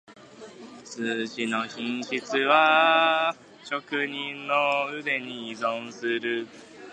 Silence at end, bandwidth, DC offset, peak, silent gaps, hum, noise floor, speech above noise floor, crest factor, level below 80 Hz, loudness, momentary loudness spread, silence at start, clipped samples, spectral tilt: 0 s; 9.6 kHz; under 0.1%; -6 dBFS; none; none; -45 dBFS; 19 dB; 22 dB; -78 dBFS; -25 LUFS; 21 LU; 0.1 s; under 0.1%; -3.5 dB/octave